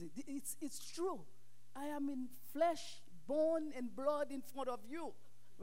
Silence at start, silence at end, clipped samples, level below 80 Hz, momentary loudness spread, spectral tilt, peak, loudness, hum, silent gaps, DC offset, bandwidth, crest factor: 0 s; 0 s; under 0.1%; -82 dBFS; 12 LU; -4 dB/octave; -24 dBFS; -42 LUFS; none; none; 0.5%; 16 kHz; 18 dB